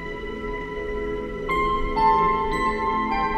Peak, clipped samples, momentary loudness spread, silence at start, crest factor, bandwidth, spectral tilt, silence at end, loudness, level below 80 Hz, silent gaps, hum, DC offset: -8 dBFS; under 0.1%; 11 LU; 0 s; 16 dB; 13.5 kHz; -6 dB/octave; 0 s; -24 LUFS; -34 dBFS; none; none; under 0.1%